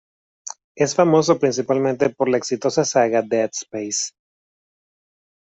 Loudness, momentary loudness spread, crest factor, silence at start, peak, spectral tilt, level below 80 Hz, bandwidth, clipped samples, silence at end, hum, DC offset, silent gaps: -20 LUFS; 14 LU; 18 dB; 0.45 s; -2 dBFS; -4.5 dB/octave; -64 dBFS; 8.4 kHz; under 0.1%; 1.3 s; none; under 0.1%; 0.64-0.75 s